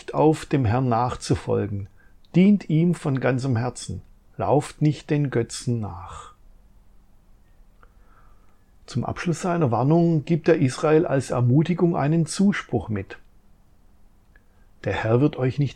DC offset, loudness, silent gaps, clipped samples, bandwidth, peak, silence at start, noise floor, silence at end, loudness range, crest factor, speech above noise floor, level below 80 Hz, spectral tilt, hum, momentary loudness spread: under 0.1%; -22 LUFS; none; under 0.1%; 11.5 kHz; -6 dBFS; 0.1 s; -54 dBFS; 0 s; 11 LU; 18 dB; 33 dB; -50 dBFS; -7 dB/octave; none; 12 LU